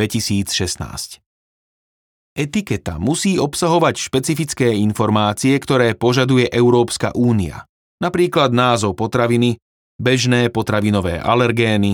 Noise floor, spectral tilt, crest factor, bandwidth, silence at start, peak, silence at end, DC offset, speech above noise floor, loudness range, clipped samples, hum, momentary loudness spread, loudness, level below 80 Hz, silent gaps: under -90 dBFS; -5 dB/octave; 16 dB; 19 kHz; 0 s; -2 dBFS; 0 s; under 0.1%; over 74 dB; 5 LU; under 0.1%; none; 9 LU; -17 LUFS; -46 dBFS; 1.26-2.36 s, 7.69-7.98 s, 9.62-9.99 s